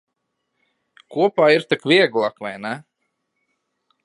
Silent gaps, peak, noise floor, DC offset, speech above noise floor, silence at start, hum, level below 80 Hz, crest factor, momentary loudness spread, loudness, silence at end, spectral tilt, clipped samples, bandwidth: none; -2 dBFS; -76 dBFS; under 0.1%; 57 dB; 1.1 s; none; -76 dBFS; 20 dB; 15 LU; -18 LUFS; 1.25 s; -5.5 dB/octave; under 0.1%; 11.5 kHz